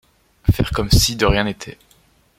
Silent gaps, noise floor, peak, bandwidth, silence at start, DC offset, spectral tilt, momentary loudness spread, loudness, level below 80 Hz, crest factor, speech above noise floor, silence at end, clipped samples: none; -56 dBFS; 0 dBFS; 16.5 kHz; 0.45 s; under 0.1%; -4.5 dB/octave; 14 LU; -18 LUFS; -26 dBFS; 18 dB; 38 dB; 0.7 s; under 0.1%